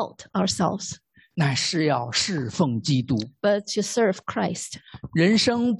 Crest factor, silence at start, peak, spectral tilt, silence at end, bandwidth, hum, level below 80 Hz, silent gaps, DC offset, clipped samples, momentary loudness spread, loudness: 16 dB; 0 s; -6 dBFS; -4.5 dB/octave; 0 s; 12 kHz; none; -56 dBFS; none; under 0.1%; under 0.1%; 12 LU; -24 LUFS